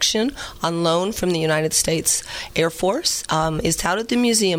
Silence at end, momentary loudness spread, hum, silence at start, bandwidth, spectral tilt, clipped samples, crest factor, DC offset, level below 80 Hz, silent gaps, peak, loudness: 0 s; 5 LU; none; 0 s; 17 kHz; -3 dB/octave; under 0.1%; 16 dB; under 0.1%; -42 dBFS; none; -4 dBFS; -20 LUFS